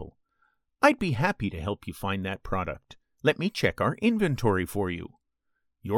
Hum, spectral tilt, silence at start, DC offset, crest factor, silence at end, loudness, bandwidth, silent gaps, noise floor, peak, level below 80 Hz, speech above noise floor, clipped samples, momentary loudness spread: none; -6 dB/octave; 0 s; under 0.1%; 22 dB; 0 s; -27 LUFS; 18 kHz; none; -77 dBFS; -6 dBFS; -50 dBFS; 50 dB; under 0.1%; 13 LU